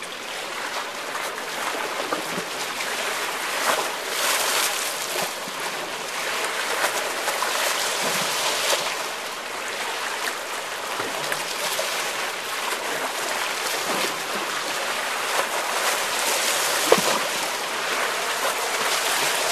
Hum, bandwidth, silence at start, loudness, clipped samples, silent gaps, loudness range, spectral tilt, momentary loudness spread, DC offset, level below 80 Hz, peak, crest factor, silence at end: none; 14 kHz; 0 s; -24 LUFS; under 0.1%; none; 4 LU; 0 dB/octave; 8 LU; 0.1%; -70 dBFS; 0 dBFS; 26 dB; 0 s